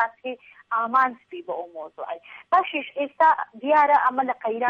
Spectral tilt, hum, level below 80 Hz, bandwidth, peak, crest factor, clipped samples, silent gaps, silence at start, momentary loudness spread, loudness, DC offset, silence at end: -5 dB/octave; none; -70 dBFS; 6.4 kHz; -8 dBFS; 16 dB; under 0.1%; none; 0 s; 17 LU; -22 LUFS; under 0.1%; 0 s